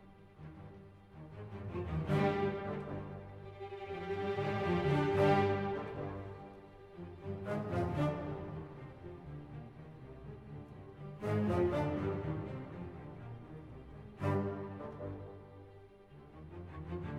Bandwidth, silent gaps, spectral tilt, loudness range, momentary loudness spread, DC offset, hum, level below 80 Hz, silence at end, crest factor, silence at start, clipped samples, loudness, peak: 11 kHz; none; -8.5 dB/octave; 8 LU; 21 LU; under 0.1%; none; -58 dBFS; 0 s; 20 dB; 0 s; under 0.1%; -37 LUFS; -18 dBFS